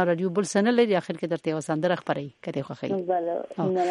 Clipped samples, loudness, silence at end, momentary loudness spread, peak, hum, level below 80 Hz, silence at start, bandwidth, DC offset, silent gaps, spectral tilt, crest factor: under 0.1%; -26 LUFS; 0 s; 9 LU; -10 dBFS; none; -72 dBFS; 0 s; 11.5 kHz; under 0.1%; none; -6 dB/octave; 16 dB